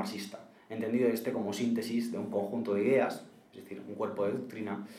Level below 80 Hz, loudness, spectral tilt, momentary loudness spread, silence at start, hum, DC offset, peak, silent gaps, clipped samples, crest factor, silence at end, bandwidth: -84 dBFS; -33 LUFS; -6 dB/octave; 17 LU; 0 s; none; under 0.1%; -16 dBFS; none; under 0.1%; 16 dB; 0 s; 15.5 kHz